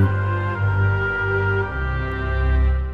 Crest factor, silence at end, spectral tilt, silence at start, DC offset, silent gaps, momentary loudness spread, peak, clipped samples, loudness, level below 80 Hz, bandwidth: 14 dB; 0 s; -9 dB/octave; 0 s; under 0.1%; none; 5 LU; -6 dBFS; under 0.1%; -21 LUFS; -24 dBFS; 5 kHz